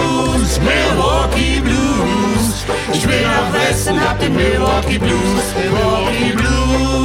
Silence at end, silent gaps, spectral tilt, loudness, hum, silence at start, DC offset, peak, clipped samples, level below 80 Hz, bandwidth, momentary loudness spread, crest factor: 0 s; none; -4.5 dB/octave; -15 LUFS; none; 0 s; under 0.1%; -2 dBFS; under 0.1%; -22 dBFS; 16.5 kHz; 3 LU; 12 dB